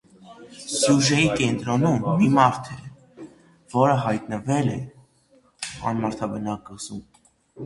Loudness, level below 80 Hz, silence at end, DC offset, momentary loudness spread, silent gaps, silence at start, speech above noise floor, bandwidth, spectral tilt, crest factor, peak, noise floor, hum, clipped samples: -22 LUFS; -54 dBFS; 0 s; under 0.1%; 19 LU; none; 0.25 s; 38 dB; 11.5 kHz; -5 dB/octave; 22 dB; -2 dBFS; -59 dBFS; none; under 0.1%